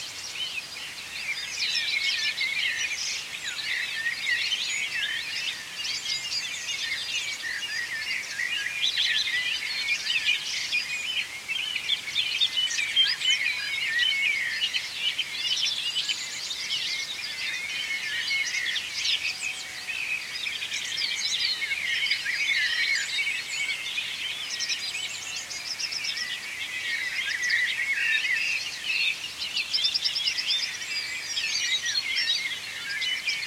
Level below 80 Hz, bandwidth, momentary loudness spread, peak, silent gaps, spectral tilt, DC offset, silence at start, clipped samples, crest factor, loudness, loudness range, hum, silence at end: -68 dBFS; 16.5 kHz; 7 LU; -12 dBFS; none; 2 dB/octave; under 0.1%; 0 s; under 0.1%; 18 dB; -26 LUFS; 4 LU; none; 0 s